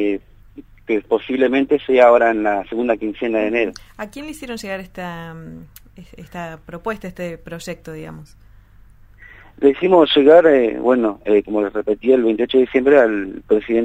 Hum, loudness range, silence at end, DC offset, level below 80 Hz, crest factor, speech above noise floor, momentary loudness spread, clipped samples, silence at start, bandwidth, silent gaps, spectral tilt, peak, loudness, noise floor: none; 17 LU; 0 s; under 0.1%; -48 dBFS; 18 dB; 29 dB; 20 LU; under 0.1%; 0 s; 15.5 kHz; none; -6 dB/octave; 0 dBFS; -16 LUFS; -46 dBFS